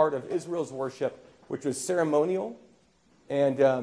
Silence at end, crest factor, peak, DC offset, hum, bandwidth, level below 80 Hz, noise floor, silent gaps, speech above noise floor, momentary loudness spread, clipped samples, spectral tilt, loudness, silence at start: 0 s; 18 dB; -10 dBFS; under 0.1%; none; 11 kHz; -74 dBFS; -63 dBFS; none; 36 dB; 10 LU; under 0.1%; -5.5 dB/octave; -29 LUFS; 0 s